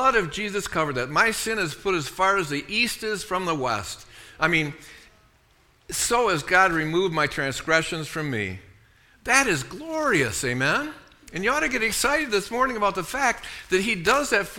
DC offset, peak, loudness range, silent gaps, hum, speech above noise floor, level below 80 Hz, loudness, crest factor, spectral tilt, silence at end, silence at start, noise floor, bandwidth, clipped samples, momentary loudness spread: under 0.1%; -4 dBFS; 3 LU; none; none; 36 dB; -50 dBFS; -23 LUFS; 20 dB; -3 dB/octave; 0 s; 0 s; -60 dBFS; 19 kHz; under 0.1%; 9 LU